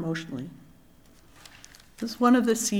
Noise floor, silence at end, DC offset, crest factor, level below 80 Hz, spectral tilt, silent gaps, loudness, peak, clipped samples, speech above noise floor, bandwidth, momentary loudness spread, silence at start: -55 dBFS; 0 s; under 0.1%; 20 dB; -62 dBFS; -4.5 dB/octave; none; -25 LUFS; -8 dBFS; under 0.1%; 30 dB; 16.5 kHz; 25 LU; 0 s